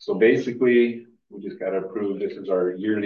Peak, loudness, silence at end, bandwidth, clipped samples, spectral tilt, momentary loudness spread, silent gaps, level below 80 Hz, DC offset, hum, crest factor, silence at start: -6 dBFS; -23 LUFS; 0 s; 6.8 kHz; under 0.1%; -7.5 dB/octave; 15 LU; none; -72 dBFS; under 0.1%; none; 16 dB; 0 s